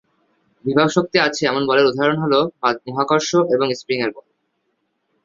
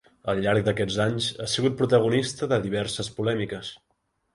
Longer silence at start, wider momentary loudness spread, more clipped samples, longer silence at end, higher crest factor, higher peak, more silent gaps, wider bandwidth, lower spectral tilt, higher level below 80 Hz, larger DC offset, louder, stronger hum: first, 0.65 s vs 0.25 s; about the same, 6 LU vs 8 LU; neither; first, 1.05 s vs 0.6 s; about the same, 18 dB vs 18 dB; first, 0 dBFS vs -8 dBFS; neither; second, 7.8 kHz vs 11.5 kHz; about the same, -4.5 dB/octave vs -5 dB/octave; second, -60 dBFS vs -54 dBFS; neither; first, -18 LUFS vs -25 LUFS; neither